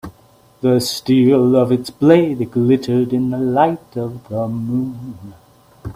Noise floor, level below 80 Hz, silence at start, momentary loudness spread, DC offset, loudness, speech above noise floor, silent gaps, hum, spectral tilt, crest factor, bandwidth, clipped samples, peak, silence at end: -50 dBFS; -52 dBFS; 0.05 s; 14 LU; under 0.1%; -16 LUFS; 34 dB; none; none; -7 dB/octave; 16 dB; 15.5 kHz; under 0.1%; 0 dBFS; 0.05 s